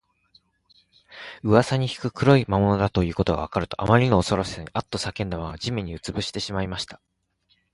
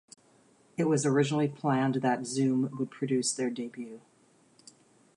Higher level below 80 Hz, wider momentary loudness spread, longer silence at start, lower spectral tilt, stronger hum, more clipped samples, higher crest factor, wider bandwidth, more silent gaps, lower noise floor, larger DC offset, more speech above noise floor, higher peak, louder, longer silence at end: first, -42 dBFS vs -78 dBFS; about the same, 12 LU vs 13 LU; first, 1.1 s vs 0.8 s; about the same, -6 dB/octave vs -5.5 dB/octave; neither; neither; first, 22 dB vs 16 dB; about the same, 11.5 kHz vs 11.5 kHz; neither; first, -68 dBFS vs -63 dBFS; neither; first, 45 dB vs 34 dB; first, -2 dBFS vs -14 dBFS; first, -24 LUFS vs -29 LUFS; second, 0.8 s vs 1.2 s